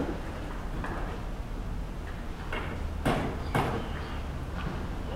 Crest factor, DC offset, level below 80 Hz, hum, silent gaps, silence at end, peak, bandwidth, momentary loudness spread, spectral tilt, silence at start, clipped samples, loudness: 18 dB; under 0.1%; -36 dBFS; none; none; 0 s; -14 dBFS; 16 kHz; 9 LU; -6.5 dB/octave; 0 s; under 0.1%; -35 LUFS